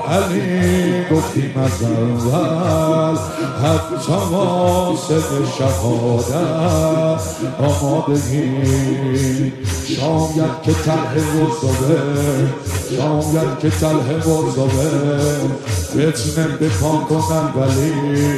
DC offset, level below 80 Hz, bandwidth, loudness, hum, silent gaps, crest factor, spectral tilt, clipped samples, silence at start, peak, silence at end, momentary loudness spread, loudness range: under 0.1%; -42 dBFS; 14 kHz; -17 LUFS; none; none; 14 dB; -6 dB/octave; under 0.1%; 0 s; -2 dBFS; 0 s; 4 LU; 1 LU